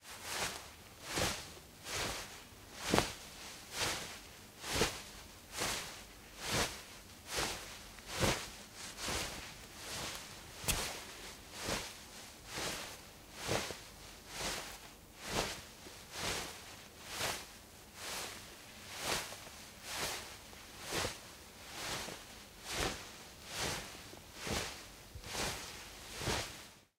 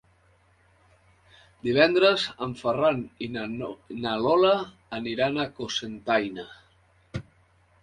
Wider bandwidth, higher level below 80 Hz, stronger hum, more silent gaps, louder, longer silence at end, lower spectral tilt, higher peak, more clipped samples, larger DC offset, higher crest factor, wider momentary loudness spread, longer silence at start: first, 16 kHz vs 10.5 kHz; about the same, -56 dBFS vs -60 dBFS; neither; neither; second, -41 LUFS vs -25 LUFS; second, 0.15 s vs 0.6 s; second, -2 dB/octave vs -5 dB/octave; about the same, -8 dBFS vs -6 dBFS; neither; neither; first, 34 dB vs 22 dB; about the same, 15 LU vs 17 LU; second, 0 s vs 1.65 s